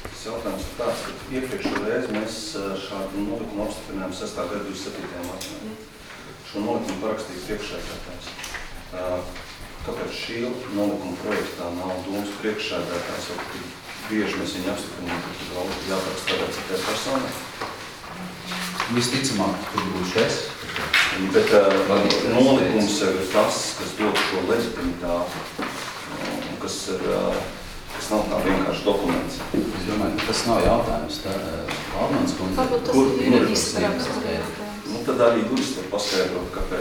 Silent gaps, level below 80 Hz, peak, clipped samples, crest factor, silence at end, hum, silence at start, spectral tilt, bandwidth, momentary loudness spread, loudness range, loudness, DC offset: none; -42 dBFS; -4 dBFS; under 0.1%; 22 dB; 0 s; none; 0 s; -4 dB/octave; over 20 kHz; 13 LU; 11 LU; -24 LUFS; under 0.1%